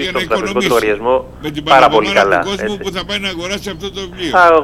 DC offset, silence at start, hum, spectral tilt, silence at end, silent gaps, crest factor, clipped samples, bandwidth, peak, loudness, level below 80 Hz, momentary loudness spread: under 0.1%; 0 s; 60 Hz at -40 dBFS; -4 dB/octave; 0 s; none; 14 dB; 0.3%; 16.5 kHz; 0 dBFS; -14 LUFS; -38 dBFS; 13 LU